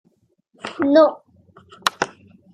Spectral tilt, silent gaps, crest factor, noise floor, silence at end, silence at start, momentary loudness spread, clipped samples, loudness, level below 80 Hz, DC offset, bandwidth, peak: -3.5 dB/octave; none; 20 dB; -63 dBFS; 0.5 s; 0.65 s; 18 LU; under 0.1%; -19 LUFS; -68 dBFS; under 0.1%; 14.5 kHz; -2 dBFS